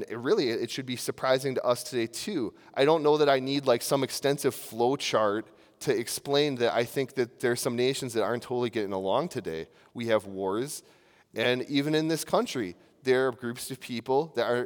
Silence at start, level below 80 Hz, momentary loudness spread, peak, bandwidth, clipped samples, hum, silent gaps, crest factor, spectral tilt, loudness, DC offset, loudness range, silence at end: 0 s; -74 dBFS; 10 LU; -10 dBFS; over 20 kHz; under 0.1%; none; none; 18 dB; -4.5 dB/octave; -28 LUFS; under 0.1%; 4 LU; 0 s